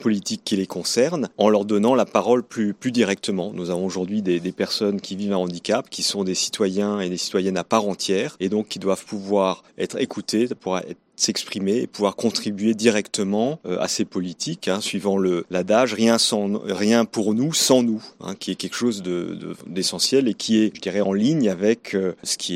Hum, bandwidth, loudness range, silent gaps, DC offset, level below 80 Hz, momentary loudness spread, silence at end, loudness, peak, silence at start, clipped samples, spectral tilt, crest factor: none; 16 kHz; 4 LU; none; under 0.1%; -68 dBFS; 8 LU; 0 s; -22 LUFS; -4 dBFS; 0 s; under 0.1%; -4 dB/octave; 18 dB